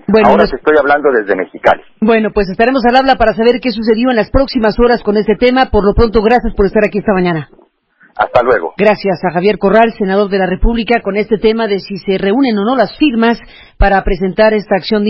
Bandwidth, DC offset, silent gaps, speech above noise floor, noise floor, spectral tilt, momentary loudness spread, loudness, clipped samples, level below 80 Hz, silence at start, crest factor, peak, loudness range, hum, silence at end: 6.6 kHz; under 0.1%; none; 39 dB; -50 dBFS; -8 dB/octave; 5 LU; -11 LUFS; under 0.1%; -24 dBFS; 0.1 s; 12 dB; 0 dBFS; 2 LU; none; 0 s